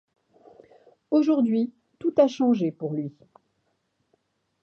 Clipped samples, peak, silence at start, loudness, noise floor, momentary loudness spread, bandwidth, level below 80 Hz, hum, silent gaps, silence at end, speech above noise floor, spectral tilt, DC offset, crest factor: under 0.1%; -6 dBFS; 1.1 s; -24 LUFS; -73 dBFS; 11 LU; 6.8 kHz; -76 dBFS; none; none; 1.5 s; 50 dB; -8 dB/octave; under 0.1%; 20 dB